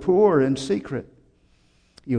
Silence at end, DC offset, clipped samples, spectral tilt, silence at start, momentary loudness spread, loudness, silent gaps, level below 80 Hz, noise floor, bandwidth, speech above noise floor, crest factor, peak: 0 s; under 0.1%; under 0.1%; -7 dB/octave; 0 s; 15 LU; -22 LUFS; none; -54 dBFS; -60 dBFS; 10 kHz; 40 dB; 16 dB; -6 dBFS